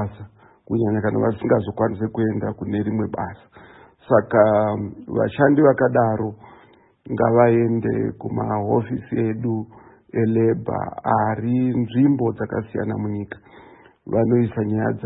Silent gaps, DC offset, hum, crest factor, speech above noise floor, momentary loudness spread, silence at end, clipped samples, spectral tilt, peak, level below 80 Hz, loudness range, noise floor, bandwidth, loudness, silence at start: none; under 0.1%; none; 18 dB; 32 dB; 11 LU; 0 s; under 0.1%; -13 dB/octave; -2 dBFS; -54 dBFS; 4 LU; -52 dBFS; 4 kHz; -21 LUFS; 0 s